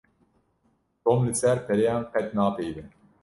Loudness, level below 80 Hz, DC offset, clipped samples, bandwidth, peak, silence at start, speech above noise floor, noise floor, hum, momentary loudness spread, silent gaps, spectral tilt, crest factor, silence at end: -25 LUFS; -56 dBFS; under 0.1%; under 0.1%; 11.5 kHz; -8 dBFS; 1.05 s; 45 dB; -69 dBFS; none; 10 LU; none; -6 dB/octave; 18 dB; 0.35 s